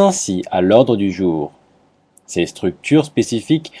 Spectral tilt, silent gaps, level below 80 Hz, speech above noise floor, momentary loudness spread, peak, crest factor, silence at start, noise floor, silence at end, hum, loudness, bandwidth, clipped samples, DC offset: -5.5 dB/octave; none; -54 dBFS; 40 dB; 10 LU; 0 dBFS; 16 dB; 0 s; -55 dBFS; 0 s; none; -17 LUFS; 11 kHz; under 0.1%; under 0.1%